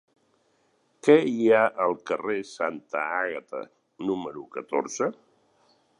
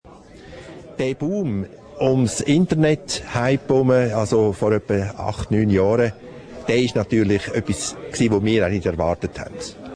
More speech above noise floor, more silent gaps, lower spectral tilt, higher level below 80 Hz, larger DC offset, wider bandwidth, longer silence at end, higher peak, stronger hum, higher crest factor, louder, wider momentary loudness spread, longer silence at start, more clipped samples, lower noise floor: first, 43 dB vs 23 dB; neither; about the same, -5 dB/octave vs -6 dB/octave; second, -74 dBFS vs -44 dBFS; neither; about the same, 10.5 kHz vs 11 kHz; first, 0.85 s vs 0 s; about the same, -6 dBFS vs -6 dBFS; neither; first, 22 dB vs 16 dB; second, -26 LUFS vs -20 LUFS; about the same, 16 LU vs 14 LU; first, 1.05 s vs 0.05 s; neither; first, -68 dBFS vs -43 dBFS